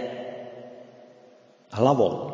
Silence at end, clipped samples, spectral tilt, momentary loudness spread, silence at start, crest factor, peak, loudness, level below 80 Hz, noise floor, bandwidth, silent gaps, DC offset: 0 s; under 0.1%; -7.5 dB/octave; 24 LU; 0 s; 22 dB; -6 dBFS; -24 LUFS; -62 dBFS; -54 dBFS; 7.6 kHz; none; under 0.1%